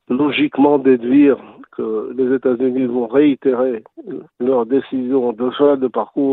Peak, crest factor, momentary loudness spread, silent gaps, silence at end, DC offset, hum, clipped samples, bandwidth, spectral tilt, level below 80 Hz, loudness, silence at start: 0 dBFS; 16 dB; 11 LU; none; 0 s; under 0.1%; none; under 0.1%; 4.1 kHz; -9.5 dB/octave; -62 dBFS; -16 LUFS; 0.1 s